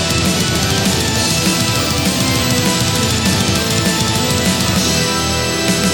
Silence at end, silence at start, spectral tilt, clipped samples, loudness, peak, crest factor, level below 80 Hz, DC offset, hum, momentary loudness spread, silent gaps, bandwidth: 0 s; 0 s; -3.5 dB/octave; under 0.1%; -14 LUFS; -2 dBFS; 14 dB; -32 dBFS; under 0.1%; none; 1 LU; none; over 20 kHz